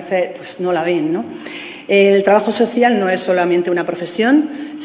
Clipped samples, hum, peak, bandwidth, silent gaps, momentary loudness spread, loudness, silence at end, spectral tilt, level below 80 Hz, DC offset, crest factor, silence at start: under 0.1%; none; 0 dBFS; 4 kHz; none; 12 LU; -15 LUFS; 0 s; -10 dB/octave; -64 dBFS; under 0.1%; 16 dB; 0 s